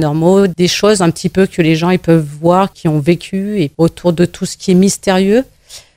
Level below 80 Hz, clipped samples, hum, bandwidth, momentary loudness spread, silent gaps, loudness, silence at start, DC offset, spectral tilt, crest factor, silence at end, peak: -42 dBFS; under 0.1%; none; 16 kHz; 5 LU; none; -12 LUFS; 0 s; under 0.1%; -6 dB/octave; 12 dB; 0.2 s; 0 dBFS